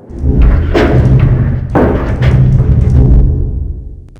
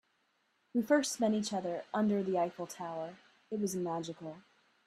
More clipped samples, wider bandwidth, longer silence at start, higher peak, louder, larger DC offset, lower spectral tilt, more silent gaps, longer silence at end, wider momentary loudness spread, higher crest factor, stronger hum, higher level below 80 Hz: first, 1% vs under 0.1%; second, 6.2 kHz vs 14 kHz; second, 0.1 s vs 0.75 s; first, 0 dBFS vs -16 dBFS; first, -10 LUFS vs -35 LUFS; neither; first, -9.5 dB/octave vs -5 dB/octave; neither; second, 0.2 s vs 0.45 s; second, 9 LU vs 14 LU; second, 8 dB vs 18 dB; neither; first, -12 dBFS vs -78 dBFS